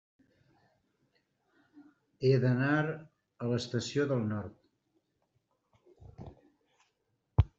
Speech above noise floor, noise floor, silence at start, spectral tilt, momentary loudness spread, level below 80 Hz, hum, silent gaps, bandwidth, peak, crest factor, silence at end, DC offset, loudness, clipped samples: 49 dB; -79 dBFS; 1.75 s; -6.5 dB/octave; 23 LU; -50 dBFS; none; none; 8 kHz; -12 dBFS; 24 dB; 0.1 s; under 0.1%; -32 LUFS; under 0.1%